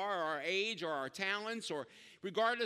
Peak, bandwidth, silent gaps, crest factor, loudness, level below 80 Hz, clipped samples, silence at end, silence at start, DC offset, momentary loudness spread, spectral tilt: -20 dBFS; 15 kHz; none; 18 dB; -38 LUFS; -88 dBFS; under 0.1%; 0 s; 0 s; under 0.1%; 9 LU; -3 dB/octave